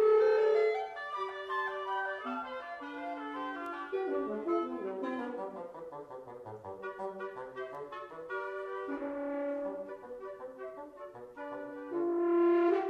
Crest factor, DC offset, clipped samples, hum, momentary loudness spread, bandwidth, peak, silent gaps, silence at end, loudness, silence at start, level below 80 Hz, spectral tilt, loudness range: 16 dB; under 0.1%; under 0.1%; none; 18 LU; 6.4 kHz; -18 dBFS; none; 0 s; -35 LUFS; 0 s; -76 dBFS; -6 dB/octave; 8 LU